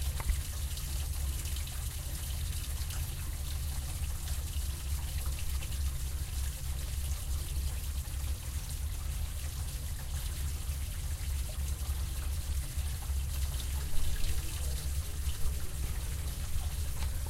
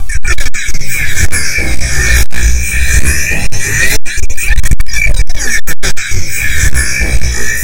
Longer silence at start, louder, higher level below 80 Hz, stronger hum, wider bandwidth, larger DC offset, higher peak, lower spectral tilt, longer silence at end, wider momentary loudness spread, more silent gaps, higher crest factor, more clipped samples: about the same, 0 s vs 0 s; second, -37 LUFS vs -13 LUFS; second, -36 dBFS vs -14 dBFS; neither; about the same, 16 kHz vs 17 kHz; neither; second, -16 dBFS vs 0 dBFS; about the same, -3.5 dB/octave vs -2.5 dB/octave; about the same, 0 s vs 0 s; second, 2 LU vs 5 LU; neither; first, 18 dB vs 4 dB; second, under 0.1% vs 20%